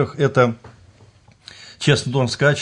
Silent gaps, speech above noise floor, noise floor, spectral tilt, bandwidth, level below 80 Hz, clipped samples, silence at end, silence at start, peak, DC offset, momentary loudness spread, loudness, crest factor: none; 33 dB; -50 dBFS; -5.5 dB/octave; 10.5 kHz; -56 dBFS; under 0.1%; 0 s; 0 s; -4 dBFS; under 0.1%; 21 LU; -18 LUFS; 16 dB